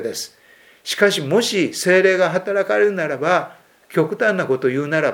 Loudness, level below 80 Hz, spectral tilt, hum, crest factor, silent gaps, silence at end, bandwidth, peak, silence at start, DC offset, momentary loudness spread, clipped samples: -18 LUFS; -72 dBFS; -4 dB/octave; none; 18 dB; none; 0 s; 18 kHz; 0 dBFS; 0 s; under 0.1%; 12 LU; under 0.1%